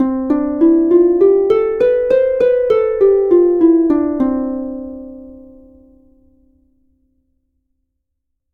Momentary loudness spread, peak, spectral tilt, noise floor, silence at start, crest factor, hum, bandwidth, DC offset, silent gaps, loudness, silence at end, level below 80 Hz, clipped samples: 13 LU; -2 dBFS; -8.5 dB/octave; -73 dBFS; 0 s; 14 dB; none; 4.2 kHz; under 0.1%; none; -13 LUFS; 3.15 s; -46 dBFS; under 0.1%